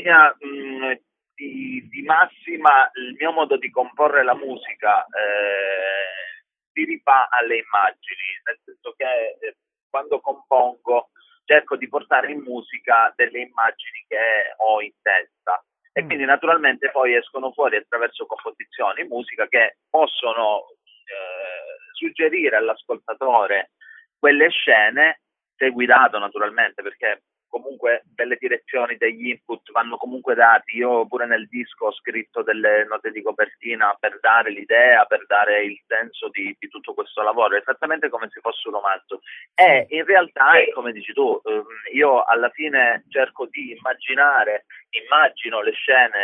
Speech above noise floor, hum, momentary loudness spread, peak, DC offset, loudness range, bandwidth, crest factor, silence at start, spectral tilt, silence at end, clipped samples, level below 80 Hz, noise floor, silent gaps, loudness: 23 dB; none; 16 LU; 0 dBFS; under 0.1%; 6 LU; 3.9 kHz; 20 dB; 0 s; -5.5 dB/octave; 0 s; under 0.1%; -84 dBFS; -43 dBFS; 6.67-6.75 s, 9.83-9.90 s; -19 LUFS